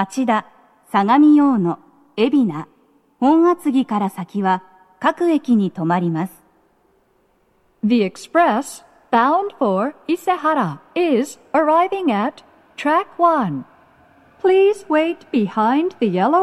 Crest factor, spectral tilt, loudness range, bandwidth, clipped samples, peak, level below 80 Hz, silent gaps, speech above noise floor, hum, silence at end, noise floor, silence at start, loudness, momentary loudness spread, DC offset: 16 dB; -6.5 dB/octave; 4 LU; 13 kHz; under 0.1%; -2 dBFS; -70 dBFS; none; 43 dB; none; 0 s; -60 dBFS; 0 s; -18 LUFS; 9 LU; under 0.1%